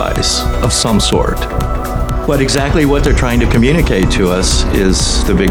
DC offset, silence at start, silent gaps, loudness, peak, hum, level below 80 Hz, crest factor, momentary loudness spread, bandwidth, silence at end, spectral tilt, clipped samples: under 0.1%; 0 s; none; -13 LUFS; 0 dBFS; none; -16 dBFS; 12 dB; 7 LU; 19 kHz; 0 s; -4.5 dB/octave; under 0.1%